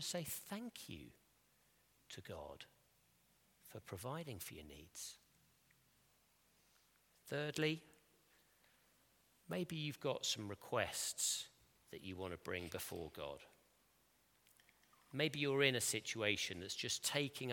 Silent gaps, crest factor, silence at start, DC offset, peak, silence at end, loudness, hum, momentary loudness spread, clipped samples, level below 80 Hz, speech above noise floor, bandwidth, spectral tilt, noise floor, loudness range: none; 28 dB; 0 s; under 0.1%; -18 dBFS; 0 s; -42 LUFS; none; 17 LU; under 0.1%; -76 dBFS; 32 dB; 17.5 kHz; -3 dB/octave; -76 dBFS; 13 LU